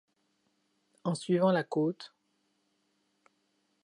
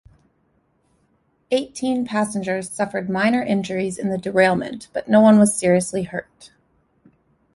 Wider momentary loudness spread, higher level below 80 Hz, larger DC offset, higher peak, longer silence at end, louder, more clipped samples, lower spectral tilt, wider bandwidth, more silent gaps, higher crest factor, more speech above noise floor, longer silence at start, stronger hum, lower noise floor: first, 17 LU vs 12 LU; second, -84 dBFS vs -58 dBFS; neither; second, -14 dBFS vs -2 dBFS; first, 1.75 s vs 1.1 s; second, -31 LUFS vs -20 LUFS; neither; about the same, -6.5 dB/octave vs -5.5 dB/octave; about the same, 11 kHz vs 11.5 kHz; neither; about the same, 20 dB vs 18 dB; about the same, 47 dB vs 45 dB; second, 1.05 s vs 1.5 s; neither; first, -76 dBFS vs -64 dBFS